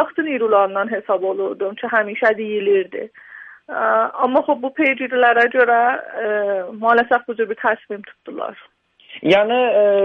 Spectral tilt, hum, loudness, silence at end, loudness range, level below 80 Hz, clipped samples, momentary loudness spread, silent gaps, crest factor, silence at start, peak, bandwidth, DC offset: -6 dB/octave; none; -18 LUFS; 0 s; 4 LU; -66 dBFS; under 0.1%; 15 LU; none; 16 dB; 0 s; -2 dBFS; 6.6 kHz; under 0.1%